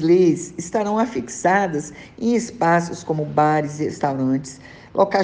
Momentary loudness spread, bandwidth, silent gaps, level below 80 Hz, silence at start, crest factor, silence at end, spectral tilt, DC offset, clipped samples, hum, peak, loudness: 8 LU; 9.8 kHz; none; -56 dBFS; 0 s; 16 dB; 0 s; -6 dB/octave; under 0.1%; under 0.1%; none; -4 dBFS; -21 LUFS